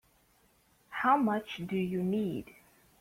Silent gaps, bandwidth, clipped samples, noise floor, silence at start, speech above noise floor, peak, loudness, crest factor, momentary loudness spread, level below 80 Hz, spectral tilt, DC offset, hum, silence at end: none; 16 kHz; under 0.1%; -68 dBFS; 0.9 s; 37 dB; -14 dBFS; -32 LUFS; 20 dB; 11 LU; -68 dBFS; -7 dB/octave; under 0.1%; none; 0.55 s